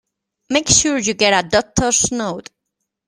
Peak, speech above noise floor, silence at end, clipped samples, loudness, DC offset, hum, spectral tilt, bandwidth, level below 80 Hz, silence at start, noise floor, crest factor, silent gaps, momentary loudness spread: 0 dBFS; 60 dB; 0.65 s; under 0.1%; -15 LUFS; under 0.1%; none; -2 dB/octave; 14.5 kHz; -42 dBFS; 0.5 s; -77 dBFS; 18 dB; none; 11 LU